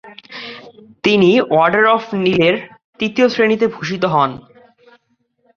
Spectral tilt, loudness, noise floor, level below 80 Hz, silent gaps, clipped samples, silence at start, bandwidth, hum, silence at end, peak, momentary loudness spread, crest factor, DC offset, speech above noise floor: -6 dB/octave; -15 LUFS; -63 dBFS; -56 dBFS; 2.84-2.93 s; under 0.1%; 0.05 s; 7.2 kHz; none; 1.2 s; 0 dBFS; 19 LU; 16 dB; under 0.1%; 49 dB